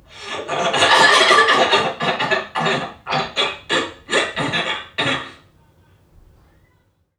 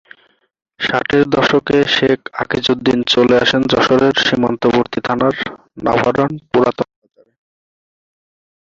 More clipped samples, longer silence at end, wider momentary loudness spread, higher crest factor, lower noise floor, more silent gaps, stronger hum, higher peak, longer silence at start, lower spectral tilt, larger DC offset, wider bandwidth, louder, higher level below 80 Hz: neither; about the same, 1.85 s vs 1.8 s; first, 13 LU vs 8 LU; about the same, 18 dB vs 14 dB; first, -61 dBFS vs -56 dBFS; neither; neither; about the same, 0 dBFS vs -2 dBFS; second, 0.15 s vs 0.8 s; second, -2.5 dB/octave vs -5 dB/octave; neither; first, 17 kHz vs 7.6 kHz; about the same, -17 LUFS vs -15 LUFS; second, -56 dBFS vs -48 dBFS